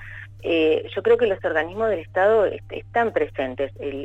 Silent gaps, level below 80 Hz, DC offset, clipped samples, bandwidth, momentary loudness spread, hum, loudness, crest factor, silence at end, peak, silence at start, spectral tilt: none; -50 dBFS; under 0.1%; under 0.1%; 7.8 kHz; 9 LU; none; -22 LUFS; 14 dB; 0 s; -8 dBFS; 0 s; -7 dB/octave